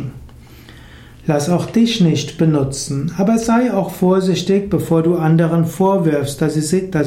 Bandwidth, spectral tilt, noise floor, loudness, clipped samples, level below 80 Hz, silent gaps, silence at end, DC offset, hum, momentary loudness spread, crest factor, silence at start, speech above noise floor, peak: 16 kHz; -6.5 dB/octave; -39 dBFS; -16 LUFS; under 0.1%; -44 dBFS; none; 0 s; under 0.1%; none; 5 LU; 12 dB; 0 s; 24 dB; -4 dBFS